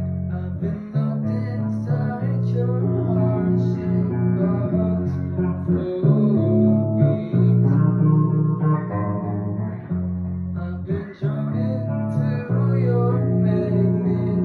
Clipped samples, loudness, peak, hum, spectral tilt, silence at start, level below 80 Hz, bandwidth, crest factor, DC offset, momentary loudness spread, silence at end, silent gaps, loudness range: under 0.1%; -21 LUFS; -6 dBFS; none; -12 dB/octave; 0 s; -48 dBFS; 4.4 kHz; 14 dB; under 0.1%; 9 LU; 0 s; none; 6 LU